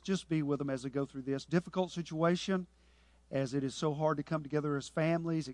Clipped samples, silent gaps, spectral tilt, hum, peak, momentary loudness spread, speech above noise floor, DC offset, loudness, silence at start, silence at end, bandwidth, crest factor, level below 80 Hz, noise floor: under 0.1%; none; -6.5 dB/octave; none; -18 dBFS; 5 LU; 31 dB; under 0.1%; -35 LUFS; 0.05 s; 0 s; 11 kHz; 18 dB; -66 dBFS; -65 dBFS